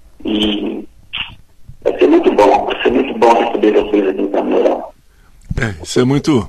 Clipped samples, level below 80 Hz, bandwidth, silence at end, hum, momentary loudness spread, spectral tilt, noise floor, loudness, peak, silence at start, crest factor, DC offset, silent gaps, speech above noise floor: under 0.1%; -38 dBFS; 13 kHz; 0 s; none; 13 LU; -6 dB/octave; -45 dBFS; -14 LUFS; 0 dBFS; 0.2 s; 14 dB; under 0.1%; none; 31 dB